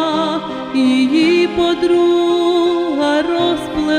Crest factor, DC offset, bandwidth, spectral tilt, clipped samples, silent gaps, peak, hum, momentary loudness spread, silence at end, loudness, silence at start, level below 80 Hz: 12 dB; under 0.1%; 9.8 kHz; -5 dB/octave; under 0.1%; none; -2 dBFS; none; 6 LU; 0 s; -15 LUFS; 0 s; -46 dBFS